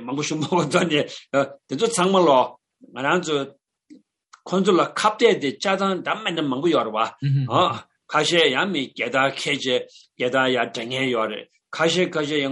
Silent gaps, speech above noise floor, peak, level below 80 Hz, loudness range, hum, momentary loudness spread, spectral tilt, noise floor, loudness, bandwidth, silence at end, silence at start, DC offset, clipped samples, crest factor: none; 32 dB; -2 dBFS; -70 dBFS; 2 LU; none; 9 LU; -4.5 dB/octave; -53 dBFS; -21 LUFS; 11.5 kHz; 0 s; 0 s; under 0.1%; under 0.1%; 20 dB